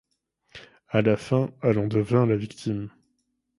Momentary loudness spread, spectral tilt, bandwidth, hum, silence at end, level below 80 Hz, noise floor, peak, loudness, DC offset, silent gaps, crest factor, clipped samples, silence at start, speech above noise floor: 9 LU; -8 dB/octave; 11.5 kHz; none; 0.7 s; -58 dBFS; -75 dBFS; -6 dBFS; -25 LUFS; under 0.1%; none; 20 dB; under 0.1%; 0.55 s; 51 dB